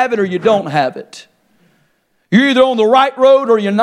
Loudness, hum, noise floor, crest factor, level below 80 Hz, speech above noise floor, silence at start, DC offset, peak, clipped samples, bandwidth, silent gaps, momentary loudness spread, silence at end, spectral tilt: -12 LUFS; none; -60 dBFS; 14 dB; -60 dBFS; 48 dB; 0 s; under 0.1%; 0 dBFS; under 0.1%; 11 kHz; none; 7 LU; 0 s; -6 dB/octave